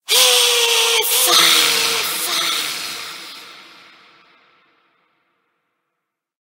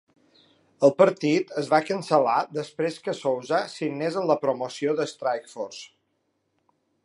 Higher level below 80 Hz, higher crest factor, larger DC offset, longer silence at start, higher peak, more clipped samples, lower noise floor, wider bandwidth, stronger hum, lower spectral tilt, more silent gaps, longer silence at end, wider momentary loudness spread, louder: about the same, -78 dBFS vs -78 dBFS; about the same, 20 dB vs 22 dB; neither; second, 0.1 s vs 0.8 s; first, 0 dBFS vs -4 dBFS; neither; first, -78 dBFS vs -74 dBFS; first, 16 kHz vs 11.5 kHz; neither; second, 2 dB/octave vs -5.5 dB/octave; neither; first, 2.85 s vs 1.2 s; first, 19 LU vs 11 LU; first, -13 LUFS vs -25 LUFS